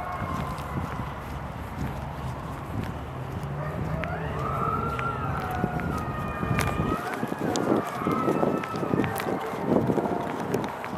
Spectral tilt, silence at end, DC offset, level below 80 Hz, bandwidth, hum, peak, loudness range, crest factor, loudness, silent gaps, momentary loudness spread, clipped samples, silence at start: -6.5 dB/octave; 0 s; under 0.1%; -44 dBFS; 16.5 kHz; none; -6 dBFS; 7 LU; 22 dB; -29 LUFS; none; 9 LU; under 0.1%; 0 s